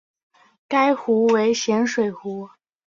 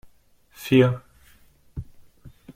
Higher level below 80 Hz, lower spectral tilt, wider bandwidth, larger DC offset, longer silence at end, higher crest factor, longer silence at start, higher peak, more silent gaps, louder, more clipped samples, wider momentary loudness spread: second, -68 dBFS vs -50 dBFS; second, -4.5 dB/octave vs -7.5 dB/octave; second, 7.6 kHz vs 16 kHz; neither; second, 0.4 s vs 0.75 s; about the same, 16 dB vs 20 dB; about the same, 0.7 s vs 0.6 s; about the same, -6 dBFS vs -6 dBFS; neither; about the same, -20 LUFS vs -21 LUFS; neither; second, 14 LU vs 21 LU